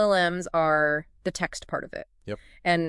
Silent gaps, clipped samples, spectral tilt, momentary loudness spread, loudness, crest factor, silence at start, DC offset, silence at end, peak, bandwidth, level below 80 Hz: none; under 0.1%; -4.5 dB/octave; 17 LU; -26 LUFS; 18 dB; 0 s; under 0.1%; 0 s; -8 dBFS; 12 kHz; -54 dBFS